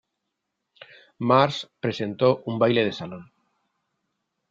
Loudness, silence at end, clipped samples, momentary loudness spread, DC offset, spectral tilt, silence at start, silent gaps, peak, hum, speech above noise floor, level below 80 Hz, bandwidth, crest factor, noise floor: -23 LUFS; 1.3 s; under 0.1%; 15 LU; under 0.1%; -6.5 dB/octave; 1.2 s; none; -4 dBFS; none; 58 dB; -66 dBFS; 7.6 kHz; 22 dB; -81 dBFS